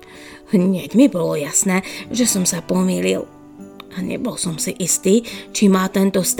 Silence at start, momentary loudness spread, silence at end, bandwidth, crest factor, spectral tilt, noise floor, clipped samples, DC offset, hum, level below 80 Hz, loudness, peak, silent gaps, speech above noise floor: 0.1 s; 12 LU; 0 s; 19 kHz; 16 dB; -4.5 dB/octave; -40 dBFS; under 0.1%; under 0.1%; none; -54 dBFS; -18 LUFS; -2 dBFS; none; 22 dB